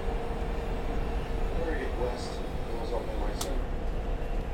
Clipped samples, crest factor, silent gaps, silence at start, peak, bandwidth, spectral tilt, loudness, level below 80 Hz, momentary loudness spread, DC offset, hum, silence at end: under 0.1%; 14 dB; none; 0 s; -16 dBFS; 16 kHz; -5.5 dB/octave; -34 LUFS; -32 dBFS; 3 LU; under 0.1%; none; 0 s